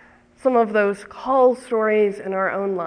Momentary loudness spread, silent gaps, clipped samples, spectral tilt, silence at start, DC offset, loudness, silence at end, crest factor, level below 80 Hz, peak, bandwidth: 6 LU; none; under 0.1%; -6.5 dB/octave; 0.45 s; under 0.1%; -20 LUFS; 0 s; 14 dB; -62 dBFS; -6 dBFS; 10.5 kHz